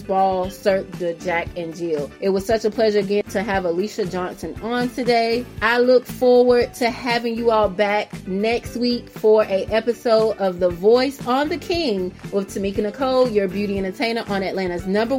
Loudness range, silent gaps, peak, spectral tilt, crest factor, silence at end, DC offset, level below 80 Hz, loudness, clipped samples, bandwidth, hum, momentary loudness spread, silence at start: 4 LU; none; -4 dBFS; -5.5 dB/octave; 16 dB; 0 s; under 0.1%; -46 dBFS; -20 LUFS; under 0.1%; 16.5 kHz; none; 9 LU; 0 s